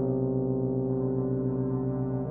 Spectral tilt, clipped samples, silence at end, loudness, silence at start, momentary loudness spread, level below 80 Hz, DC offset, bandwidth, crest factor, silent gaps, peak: -15 dB/octave; under 0.1%; 0 s; -29 LUFS; 0 s; 2 LU; -50 dBFS; under 0.1%; 1.9 kHz; 14 dB; none; -14 dBFS